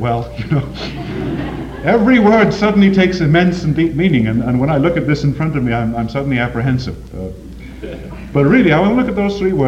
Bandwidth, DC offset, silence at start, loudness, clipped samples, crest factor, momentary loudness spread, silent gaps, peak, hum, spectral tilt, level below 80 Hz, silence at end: 8.6 kHz; under 0.1%; 0 s; -14 LUFS; under 0.1%; 14 dB; 17 LU; none; 0 dBFS; none; -8 dB/octave; -34 dBFS; 0 s